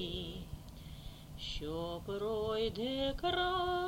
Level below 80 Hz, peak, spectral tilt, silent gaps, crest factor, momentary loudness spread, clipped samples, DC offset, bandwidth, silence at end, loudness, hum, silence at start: -50 dBFS; -22 dBFS; -5.5 dB/octave; none; 14 dB; 17 LU; under 0.1%; under 0.1%; 16.5 kHz; 0 s; -37 LUFS; none; 0 s